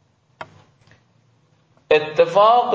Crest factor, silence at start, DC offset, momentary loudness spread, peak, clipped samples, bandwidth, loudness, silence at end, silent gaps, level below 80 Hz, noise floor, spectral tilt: 18 dB; 0.4 s; under 0.1%; 26 LU; -2 dBFS; under 0.1%; 8 kHz; -16 LUFS; 0 s; none; -62 dBFS; -59 dBFS; -5 dB/octave